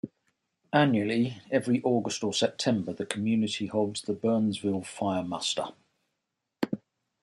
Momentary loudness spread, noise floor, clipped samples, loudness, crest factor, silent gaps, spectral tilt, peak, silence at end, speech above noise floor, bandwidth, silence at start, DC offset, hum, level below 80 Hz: 9 LU; -83 dBFS; under 0.1%; -29 LUFS; 22 dB; none; -5 dB/octave; -8 dBFS; 0.45 s; 56 dB; 11.5 kHz; 0.05 s; under 0.1%; none; -72 dBFS